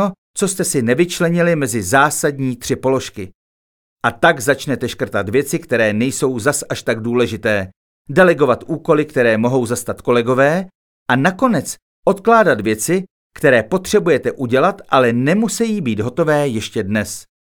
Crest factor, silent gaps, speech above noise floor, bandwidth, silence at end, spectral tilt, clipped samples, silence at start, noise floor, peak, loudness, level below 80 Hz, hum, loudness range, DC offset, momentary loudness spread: 16 dB; 0.18-0.34 s, 3.35-3.97 s, 7.76-8.05 s, 10.75-11.06 s, 11.82-12.03 s, 13.11-13.30 s; over 74 dB; 19.5 kHz; 0.25 s; -5 dB/octave; under 0.1%; 0 s; under -90 dBFS; 0 dBFS; -16 LUFS; -52 dBFS; none; 3 LU; under 0.1%; 8 LU